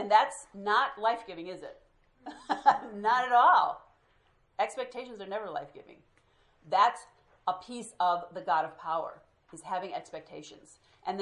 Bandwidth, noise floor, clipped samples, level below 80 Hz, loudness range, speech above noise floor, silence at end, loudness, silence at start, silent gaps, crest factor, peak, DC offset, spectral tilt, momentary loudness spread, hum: 11.5 kHz; -68 dBFS; under 0.1%; -74 dBFS; 6 LU; 38 dB; 0 s; -29 LUFS; 0 s; none; 22 dB; -10 dBFS; under 0.1%; -3 dB/octave; 21 LU; none